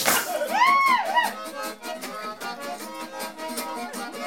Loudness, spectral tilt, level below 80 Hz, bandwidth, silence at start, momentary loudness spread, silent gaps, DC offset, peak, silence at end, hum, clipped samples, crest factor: -25 LUFS; -1 dB/octave; -68 dBFS; 17.5 kHz; 0 s; 15 LU; none; 0.2%; -4 dBFS; 0 s; none; under 0.1%; 22 dB